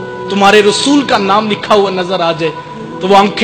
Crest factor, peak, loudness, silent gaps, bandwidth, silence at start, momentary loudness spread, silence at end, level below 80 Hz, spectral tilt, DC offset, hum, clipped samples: 10 dB; 0 dBFS; -10 LUFS; none; 13 kHz; 0 s; 11 LU; 0 s; -48 dBFS; -4 dB/octave; under 0.1%; none; 0.8%